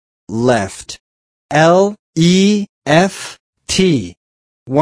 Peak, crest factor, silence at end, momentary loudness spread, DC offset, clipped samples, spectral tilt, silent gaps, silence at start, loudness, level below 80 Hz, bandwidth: 0 dBFS; 14 dB; 0 s; 19 LU; under 0.1%; under 0.1%; -5 dB/octave; 1.00-1.49 s, 1.99-2.13 s, 2.69-2.82 s, 3.40-3.53 s, 4.17-4.66 s; 0.3 s; -14 LUFS; -46 dBFS; 11 kHz